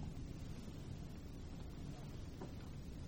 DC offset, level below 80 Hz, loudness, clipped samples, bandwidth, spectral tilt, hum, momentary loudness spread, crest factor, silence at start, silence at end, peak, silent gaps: under 0.1%; -54 dBFS; -51 LUFS; under 0.1%; 16.5 kHz; -6.5 dB/octave; none; 2 LU; 14 dB; 0 s; 0 s; -36 dBFS; none